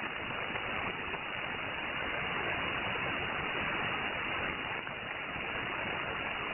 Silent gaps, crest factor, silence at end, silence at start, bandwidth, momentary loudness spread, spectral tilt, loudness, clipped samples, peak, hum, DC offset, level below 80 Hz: none; 16 dB; 0 s; 0 s; 3.2 kHz; 4 LU; -7.5 dB/octave; -35 LUFS; under 0.1%; -20 dBFS; none; under 0.1%; -56 dBFS